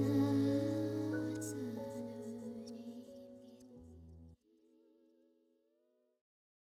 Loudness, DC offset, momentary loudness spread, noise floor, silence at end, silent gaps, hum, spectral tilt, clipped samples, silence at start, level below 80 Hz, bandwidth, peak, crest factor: -39 LUFS; under 0.1%; 25 LU; -78 dBFS; 2.3 s; none; none; -7 dB/octave; under 0.1%; 0 s; -72 dBFS; 14.5 kHz; -24 dBFS; 18 dB